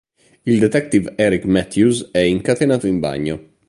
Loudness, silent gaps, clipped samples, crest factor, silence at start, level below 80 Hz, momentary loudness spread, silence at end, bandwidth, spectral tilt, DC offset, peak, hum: -17 LUFS; none; under 0.1%; 16 dB; 0.45 s; -44 dBFS; 6 LU; 0.25 s; 11.5 kHz; -6 dB/octave; under 0.1%; -2 dBFS; none